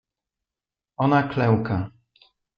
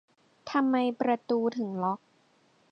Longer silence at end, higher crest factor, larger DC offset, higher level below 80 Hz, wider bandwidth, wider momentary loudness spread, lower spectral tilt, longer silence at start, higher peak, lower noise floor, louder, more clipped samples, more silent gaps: about the same, 0.7 s vs 0.75 s; about the same, 18 dB vs 16 dB; neither; first, -56 dBFS vs -78 dBFS; about the same, 6.6 kHz vs 6.6 kHz; first, 14 LU vs 7 LU; first, -9.5 dB/octave vs -7 dB/octave; first, 1 s vs 0.45 s; first, -6 dBFS vs -14 dBFS; first, -90 dBFS vs -66 dBFS; first, -22 LUFS vs -29 LUFS; neither; neither